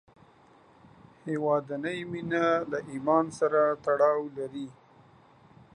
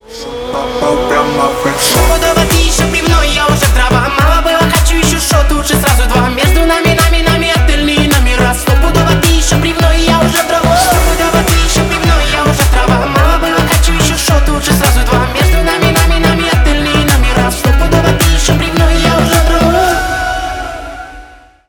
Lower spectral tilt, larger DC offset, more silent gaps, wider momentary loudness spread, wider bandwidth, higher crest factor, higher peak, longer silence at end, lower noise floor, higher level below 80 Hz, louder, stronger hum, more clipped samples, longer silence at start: first, -6.5 dB/octave vs -4 dB/octave; neither; neither; first, 12 LU vs 3 LU; second, 10.5 kHz vs over 20 kHz; first, 20 dB vs 10 dB; second, -10 dBFS vs 0 dBFS; first, 1 s vs 0.45 s; first, -58 dBFS vs -35 dBFS; second, -70 dBFS vs -14 dBFS; second, -28 LUFS vs -10 LUFS; neither; neither; first, 1.25 s vs 0.1 s